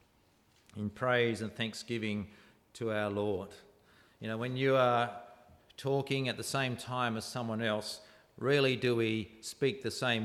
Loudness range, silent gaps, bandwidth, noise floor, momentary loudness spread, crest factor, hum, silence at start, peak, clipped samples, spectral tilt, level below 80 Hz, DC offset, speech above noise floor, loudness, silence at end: 3 LU; none; 15 kHz; -68 dBFS; 13 LU; 18 dB; none; 0.75 s; -16 dBFS; under 0.1%; -5 dB/octave; -70 dBFS; under 0.1%; 35 dB; -33 LUFS; 0 s